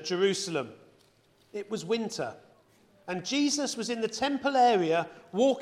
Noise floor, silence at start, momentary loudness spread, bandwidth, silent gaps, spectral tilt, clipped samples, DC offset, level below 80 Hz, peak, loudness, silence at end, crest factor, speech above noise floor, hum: -64 dBFS; 0 s; 15 LU; 14.5 kHz; none; -3.5 dB/octave; under 0.1%; under 0.1%; -74 dBFS; -12 dBFS; -29 LUFS; 0 s; 16 dB; 36 dB; none